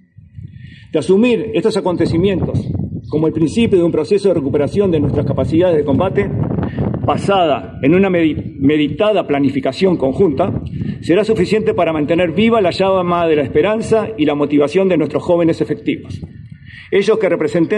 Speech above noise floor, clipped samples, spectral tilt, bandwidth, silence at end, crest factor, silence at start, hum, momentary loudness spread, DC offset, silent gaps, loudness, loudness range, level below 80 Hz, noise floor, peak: 21 dB; under 0.1%; -7.5 dB/octave; 10.5 kHz; 0 s; 14 dB; 0.35 s; none; 8 LU; under 0.1%; none; -15 LUFS; 2 LU; -40 dBFS; -35 dBFS; -2 dBFS